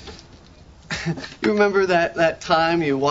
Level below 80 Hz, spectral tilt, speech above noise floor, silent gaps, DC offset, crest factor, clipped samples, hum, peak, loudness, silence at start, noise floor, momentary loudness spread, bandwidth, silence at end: -50 dBFS; -5.5 dB/octave; 27 dB; none; under 0.1%; 18 dB; under 0.1%; none; -4 dBFS; -20 LUFS; 0 s; -46 dBFS; 10 LU; 7.8 kHz; 0 s